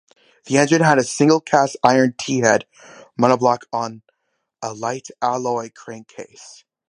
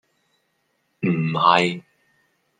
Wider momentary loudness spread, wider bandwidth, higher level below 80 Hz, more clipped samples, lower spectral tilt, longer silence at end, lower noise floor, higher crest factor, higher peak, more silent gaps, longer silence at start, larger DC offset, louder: first, 21 LU vs 11 LU; first, 11 kHz vs 9.4 kHz; about the same, -66 dBFS vs -70 dBFS; neither; second, -4.5 dB/octave vs -6 dB/octave; second, 0.4 s vs 0.8 s; about the same, -73 dBFS vs -70 dBFS; about the same, 20 dB vs 22 dB; about the same, 0 dBFS vs -2 dBFS; neither; second, 0.45 s vs 1 s; neither; about the same, -18 LUFS vs -20 LUFS